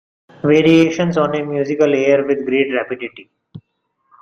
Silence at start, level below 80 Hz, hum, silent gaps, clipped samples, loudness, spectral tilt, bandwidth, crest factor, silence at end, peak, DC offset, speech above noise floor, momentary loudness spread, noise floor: 0.45 s; -56 dBFS; none; none; under 0.1%; -15 LUFS; -6.5 dB/octave; 7.2 kHz; 16 dB; 0.65 s; -2 dBFS; under 0.1%; 53 dB; 11 LU; -69 dBFS